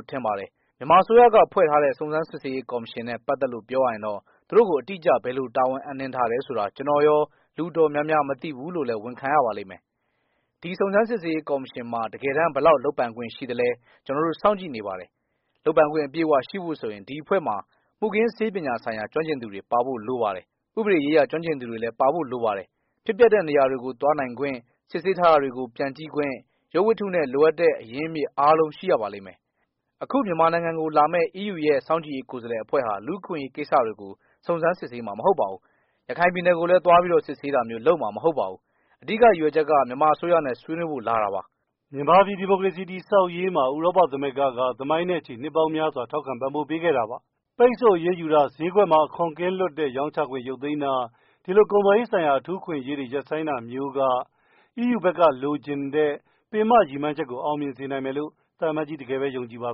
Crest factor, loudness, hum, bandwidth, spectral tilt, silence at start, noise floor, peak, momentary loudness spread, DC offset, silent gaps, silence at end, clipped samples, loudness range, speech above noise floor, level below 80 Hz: 18 dB; -23 LUFS; none; 5.6 kHz; -4.5 dB/octave; 0.1 s; -75 dBFS; -6 dBFS; 13 LU; under 0.1%; none; 0 s; under 0.1%; 4 LU; 52 dB; -64 dBFS